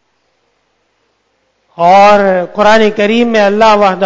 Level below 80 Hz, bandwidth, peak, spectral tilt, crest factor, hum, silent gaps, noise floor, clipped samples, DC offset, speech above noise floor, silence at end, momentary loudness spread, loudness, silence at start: -46 dBFS; 8 kHz; 0 dBFS; -5 dB/octave; 10 dB; none; none; -59 dBFS; 1%; under 0.1%; 52 dB; 0 s; 6 LU; -8 LUFS; 1.75 s